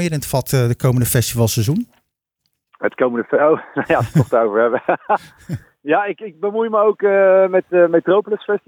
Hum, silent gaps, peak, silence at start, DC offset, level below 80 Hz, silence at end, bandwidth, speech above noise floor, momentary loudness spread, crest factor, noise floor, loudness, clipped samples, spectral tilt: none; none; -2 dBFS; 0 s; under 0.1%; -48 dBFS; 0.1 s; over 20 kHz; 56 dB; 10 LU; 14 dB; -72 dBFS; -17 LUFS; under 0.1%; -6 dB/octave